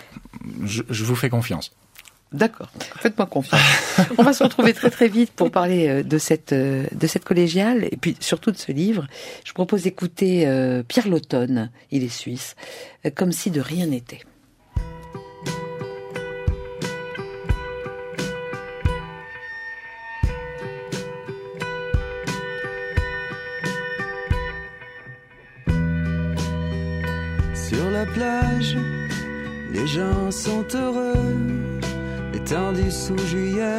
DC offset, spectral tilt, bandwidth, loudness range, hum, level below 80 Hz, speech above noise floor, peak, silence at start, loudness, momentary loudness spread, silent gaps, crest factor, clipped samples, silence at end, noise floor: under 0.1%; -5.5 dB/octave; 16 kHz; 11 LU; none; -36 dBFS; 26 dB; -2 dBFS; 0 s; -23 LUFS; 15 LU; none; 22 dB; under 0.1%; 0 s; -46 dBFS